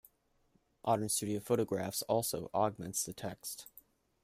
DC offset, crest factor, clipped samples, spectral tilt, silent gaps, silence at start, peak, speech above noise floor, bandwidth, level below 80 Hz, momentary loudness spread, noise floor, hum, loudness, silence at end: under 0.1%; 20 dB; under 0.1%; -4 dB/octave; none; 0.85 s; -18 dBFS; 38 dB; 15.5 kHz; -70 dBFS; 11 LU; -74 dBFS; none; -35 LUFS; 0.45 s